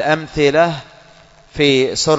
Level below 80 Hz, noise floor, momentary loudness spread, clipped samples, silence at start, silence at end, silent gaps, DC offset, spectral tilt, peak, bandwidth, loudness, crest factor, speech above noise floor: -44 dBFS; -46 dBFS; 13 LU; under 0.1%; 0 s; 0 s; none; under 0.1%; -4 dB/octave; 0 dBFS; 8 kHz; -15 LUFS; 16 dB; 31 dB